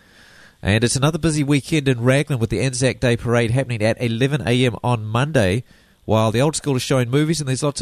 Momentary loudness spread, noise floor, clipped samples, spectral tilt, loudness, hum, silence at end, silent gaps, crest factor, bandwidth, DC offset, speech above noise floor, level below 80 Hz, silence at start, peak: 4 LU; -48 dBFS; under 0.1%; -5.5 dB/octave; -19 LUFS; none; 0 s; none; 16 dB; 13.5 kHz; under 0.1%; 29 dB; -44 dBFS; 0.65 s; -2 dBFS